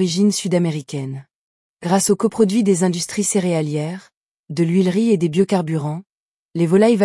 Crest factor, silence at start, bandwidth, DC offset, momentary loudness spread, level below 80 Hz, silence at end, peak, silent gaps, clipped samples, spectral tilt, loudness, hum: 14 dB; 0 s; 12 kHz; under 0.1%; 13 LU; -64 dBFS; 0 s; -4 dBFS; 1.35-1.75 s, 4.17-4.44 s, 6.12-6.49 s; under 0.1%; -5.5 dB/octave; -18 LUFS; none